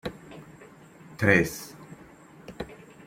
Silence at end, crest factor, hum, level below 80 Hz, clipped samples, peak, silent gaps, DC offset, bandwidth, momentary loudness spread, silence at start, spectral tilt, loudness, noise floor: 0.35 s; 26 dB; none; -56 dBFS; under 0.1%; -4 dBFS; none; under 0.1%; 16.5 kHz; 27 LU; 0.05 s; -5.5 dB/octave; -24 LUFS; -51 dBFS